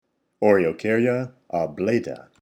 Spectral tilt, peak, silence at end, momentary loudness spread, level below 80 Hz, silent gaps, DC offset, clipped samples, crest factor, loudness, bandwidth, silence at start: -7.5 dB/octave; -4 dBFS; 0.25 s; 9 LU; -62 dBFS; none; under 0.1%; under 0.1%; 18 dB; -22 LUFS; 11 kHz; 0.4 s